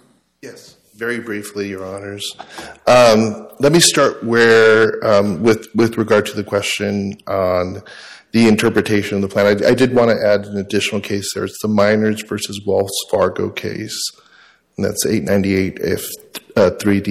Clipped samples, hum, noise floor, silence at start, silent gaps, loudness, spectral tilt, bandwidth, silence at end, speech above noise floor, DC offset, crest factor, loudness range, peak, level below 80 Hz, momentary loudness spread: under 0.1%; none; -50 dBFS; 0.45 s; none; -16 LUFS; -4.5 dB/octave; 16 kHz; 0 s; 34 dB; under 0.1%; 16 dB; 7 LU; 0 dBFS; -52 dBFS; 15 LU